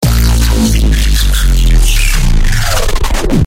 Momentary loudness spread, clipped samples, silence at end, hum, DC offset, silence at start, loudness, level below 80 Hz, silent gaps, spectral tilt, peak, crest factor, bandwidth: 3 LU; under 0.1%; 0 s; none; under 0.1%; 0 s; -12 LUFS; -10 dBFS; none; -4.5 dB/octave; 0 dBFS; 8 dB; 16.5 kHz